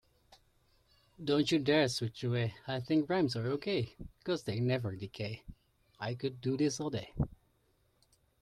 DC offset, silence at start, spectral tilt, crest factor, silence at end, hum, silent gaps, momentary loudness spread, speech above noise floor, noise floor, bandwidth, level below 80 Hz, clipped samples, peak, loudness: under 0.1%; 1.2 s; -6 dB/octave; 20 dB; 1.15 s; none; none; 12 LU; 39 dB; -73 dBFS; 13 kHz; -58 dBFS; under 0.1%; -16 dBFS; -34 LUFS